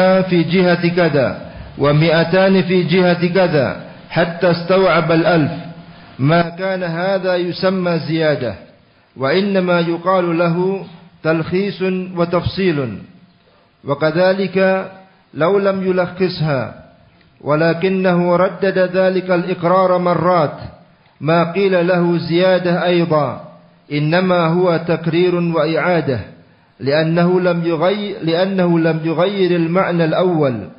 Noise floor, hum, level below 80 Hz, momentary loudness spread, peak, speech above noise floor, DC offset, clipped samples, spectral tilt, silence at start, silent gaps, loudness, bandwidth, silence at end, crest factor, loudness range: -52 dBFS; none; -50 dBFS; 9 LU; -2 dBFS; 37 dB; under 0.1%; under 0.1%; -12.5 dB/octave; 0 s; none; -16 LUFS; 5.6 kHz; 0.05 s; 14 dB; 4 LU